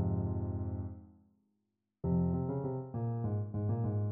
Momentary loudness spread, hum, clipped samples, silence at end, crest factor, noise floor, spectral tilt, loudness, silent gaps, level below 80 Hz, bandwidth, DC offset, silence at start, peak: 9 LU; none; under 0.1%; 0 s; 14 dB; -83 dBFS; -14.5 dB/octave; -36 LUFS; none; -54 dBFS; 2 kHz; under 0.1%; 0 s; -22 dBFS